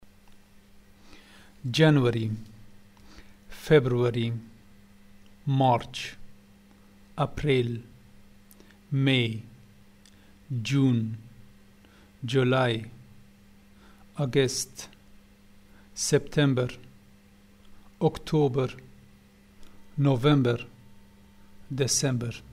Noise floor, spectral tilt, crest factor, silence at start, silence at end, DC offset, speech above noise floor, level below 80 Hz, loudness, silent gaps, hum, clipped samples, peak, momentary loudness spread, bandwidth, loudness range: -55 dBFS; -5.5 dB/octave; 22 dB; 0.3 s; 0 s; under 0.1%; 31 dB; -54 dBFS; -26 LUFS; none; none; under 0.1%; -8 dBFS; 18 LU; 15.5 kHz; 4 LU